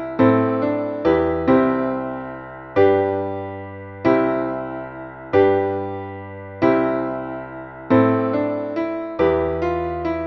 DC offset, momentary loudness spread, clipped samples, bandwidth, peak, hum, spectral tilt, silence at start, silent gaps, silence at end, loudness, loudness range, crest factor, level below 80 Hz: under 0.1%; 16 LU; under 0.1%; 6 kHz; -4 dBFS; none; -9.5 dB/octave; 0 s; none; 0 s; -20 LUFS; 2 LU; 16 dB; -46 dBFS